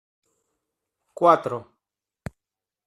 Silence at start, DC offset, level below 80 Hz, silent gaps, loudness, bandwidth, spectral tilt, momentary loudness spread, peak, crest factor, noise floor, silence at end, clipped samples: 1.2 s; under 0.1%; -60 dBFS; none; -21 LUFS; 13 kHz; -7 dB/octave; 23 LU; -4 dBFS; 24 dB; -88 dBFS; 1.25 s; under 0.1%